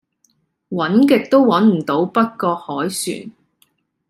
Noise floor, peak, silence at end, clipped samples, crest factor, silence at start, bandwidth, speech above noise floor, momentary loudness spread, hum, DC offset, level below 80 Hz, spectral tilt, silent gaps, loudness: -63 dBFS; -2 dBFS; 0.8 s; under 0.1%; 16 dB; 0.7 s; 15 kHz; 47 dB; 11 LU; none; under 0.1%; -66 dBFS; -5.5 dB/octave; none; -16 LUFS